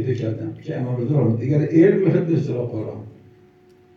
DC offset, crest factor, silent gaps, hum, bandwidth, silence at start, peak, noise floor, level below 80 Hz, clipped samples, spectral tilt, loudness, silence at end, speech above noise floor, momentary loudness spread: under 0.1%; 16 dB; none; none; 6.8 kHz; 0 s; -4 dBFS; -52 dBFS; -62 dBFS; under 0.1%; -10 dB/octave; -20 LUFS; 0.85 s; 32 dB; 14 LU